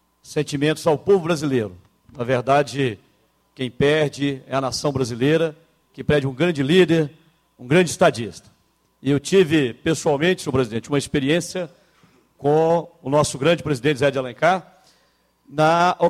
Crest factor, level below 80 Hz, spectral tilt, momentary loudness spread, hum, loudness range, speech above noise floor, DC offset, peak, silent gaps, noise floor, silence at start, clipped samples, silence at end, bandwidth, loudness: 18 dB; -52 dBFS; -5.5 dB/octave; 12 LU; none; 2 LU; 43 dB; under 0.1%; -4 dBFS; none; -63 dBFS; 0.3 s; under 0.1%; 0 s; 15 kHz; -20 LUFS